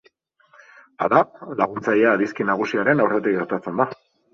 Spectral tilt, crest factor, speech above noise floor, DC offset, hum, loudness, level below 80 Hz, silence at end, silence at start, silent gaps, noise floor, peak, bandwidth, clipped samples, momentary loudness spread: -7 dB/octave; 22 dB; 40 dB; under 0.1%; none; -21 LUFS; -64 dBFS; 0.4 s; 1 s; none; -60 dBFS; 0 dBFS; 7.2 kHz; under 0.1%; 7 LU